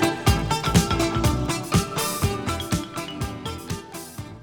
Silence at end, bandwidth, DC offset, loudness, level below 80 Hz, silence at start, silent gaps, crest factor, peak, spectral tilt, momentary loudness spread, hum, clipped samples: 0 s; over 20 kHz; under 0.1%; -24 LUFS; -34 dBFS; 0 s; none; 18 dB; -6 dBFS; -4.5 dB/octave; 13 LU; none; under 0.1%